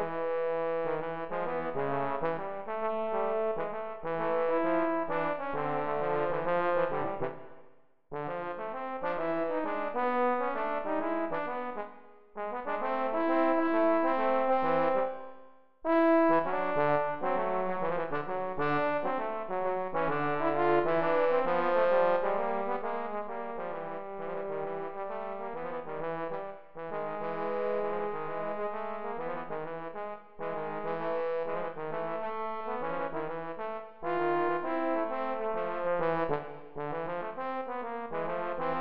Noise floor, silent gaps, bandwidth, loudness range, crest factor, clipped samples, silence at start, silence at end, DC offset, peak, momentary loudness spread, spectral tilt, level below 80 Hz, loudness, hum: -60 dBFS; none; 5.4 kHz; 8 LU; 16 dB; under 0.1%; 0 s; 0 s; 0.8%; -14 dBFS; 11 LU; -4.5 dB/octave; -62 dBFS; -32 LUFS; none